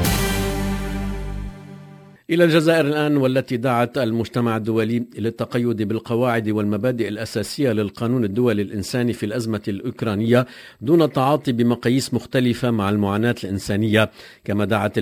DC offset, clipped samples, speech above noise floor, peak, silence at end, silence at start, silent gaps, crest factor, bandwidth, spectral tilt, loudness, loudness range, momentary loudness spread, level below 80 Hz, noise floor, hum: under 0.1%; under 0.1%; 23 dB; -2 dBFS; 0 s; 0 s; none; 18 dB; 16 kHz; -6 dB/octave; -21 LUFS; 3 LU; 9 LU; -38 dBFS; -43 dBFS; none